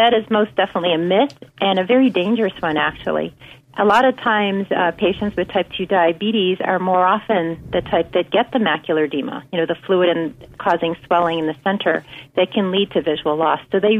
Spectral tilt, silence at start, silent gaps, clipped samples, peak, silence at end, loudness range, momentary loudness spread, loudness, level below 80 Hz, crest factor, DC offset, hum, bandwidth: -6.5 dB/octave; 0 s; none; under 0.1%; -4 dBFS; 0 s; 2 LU; 7 LU; -18 LUFS; -52 dBFS; 14 dB; under 0.1%; none; 9.8 kHz